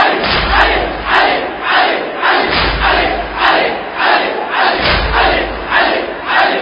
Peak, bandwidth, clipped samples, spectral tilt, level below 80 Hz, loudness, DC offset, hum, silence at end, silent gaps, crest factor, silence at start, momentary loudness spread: 0 dBFS; 8 kHz; under 0.1%; -6 dB/octave; -26 dBFS; -12 LUFS; under 0.1%; none; 0 s; none; 12 dB; 0 s; 4 LU